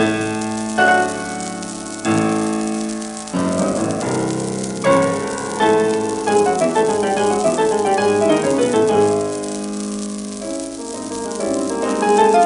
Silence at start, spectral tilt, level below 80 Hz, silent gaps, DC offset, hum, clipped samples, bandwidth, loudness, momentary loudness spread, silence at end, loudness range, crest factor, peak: 0 s; -4.5 dB/octave; -52 dBFS; none; under 0.1%; none; under 0.1%; 11.5 kHz; -18 LUFS; 11 LU; 0 s; 4 LU; 16 dB; -2 dBFS